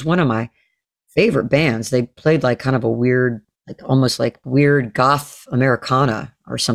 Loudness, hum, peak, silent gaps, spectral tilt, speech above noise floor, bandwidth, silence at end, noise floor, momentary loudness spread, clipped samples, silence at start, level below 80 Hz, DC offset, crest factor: -18 LUFS; none; -2 dBFS; none; -6 dB/octave; 48 dB; 14.5 kHz; 0 s; -65 dBFS; 8 LU; under 0.1%; 0 s; -50 dBFS; under 0.1%; 16 dB